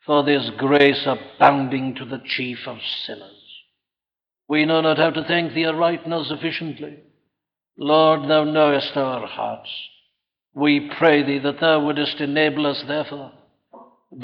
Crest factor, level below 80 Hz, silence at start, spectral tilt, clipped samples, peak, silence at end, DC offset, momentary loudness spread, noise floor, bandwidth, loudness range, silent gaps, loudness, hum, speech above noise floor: 20 dB; -66 dBFS; 0.1 s; -7.5 dB/octave; under 0.1%; -2 dBFS; 0 s; under 0.1%; 15 LU; under -90 dBFS; 5.8 kHz; 3 LU; none; -20 LUFS; none; over 70 dB